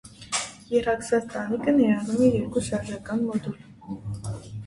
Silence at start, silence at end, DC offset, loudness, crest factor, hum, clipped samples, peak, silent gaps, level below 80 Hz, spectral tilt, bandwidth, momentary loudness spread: 0.05 s; 0 s; under 0.1%; -26 LUFS; 18 dB; none; under 0.1%; -8 dBFS; none; -52 dBFS; -5.5 dB/octave; 11.5 kHz; 14 LU